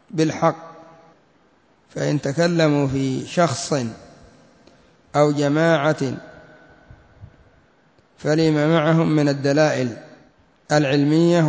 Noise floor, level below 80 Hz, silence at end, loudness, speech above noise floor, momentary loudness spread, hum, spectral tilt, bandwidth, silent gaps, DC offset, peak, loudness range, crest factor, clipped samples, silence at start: -58 dBFS; -56 dBFS; 0 s; -19 LUFS; 40 dB; 10 LU; none; -6 dB/octave; 8 kHz; none; under 0.1%; -4 dBFS; 3 LU; 18 dB; under 0.1%; 0.15 s